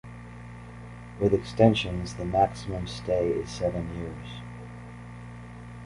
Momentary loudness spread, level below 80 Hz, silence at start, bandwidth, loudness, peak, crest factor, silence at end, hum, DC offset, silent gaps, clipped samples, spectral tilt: 22 LU; -46 dBFS; 0.05 s; 11.5 kHz; -27 LUFS; -6 dBFS; 24 dB; 0 s; 60 Hz at -55 dBFS; under 0.1%; none; under 0.1%; -6.5 dB/octave